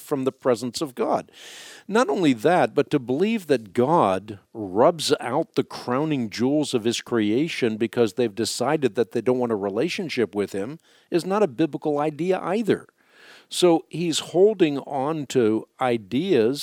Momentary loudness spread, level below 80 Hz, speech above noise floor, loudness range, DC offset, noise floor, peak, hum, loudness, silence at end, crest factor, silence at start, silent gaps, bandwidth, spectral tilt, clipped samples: 8 LU; -72 dBFS; 28 dB; 3 LU; under 0.1%; -51 dBFS; -6 dBFS; none; -23 LUFS; 0 s; 18 dB; 0 s; none; 17 kHz; -5 dB/octave; under 0.1%